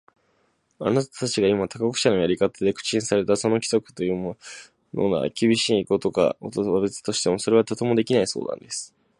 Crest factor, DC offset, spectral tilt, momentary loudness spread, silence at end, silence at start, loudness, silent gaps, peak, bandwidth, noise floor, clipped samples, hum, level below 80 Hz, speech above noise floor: 20 dB; under 0.1%; -4.5 dB/octave; 9 LU; 0.35 s; 0.8 s; -23 LUFS; none; -4 dBFS; 11.5 kHz; -67 dBFS; under 0.1%; none; -58 dBFS; 45 dB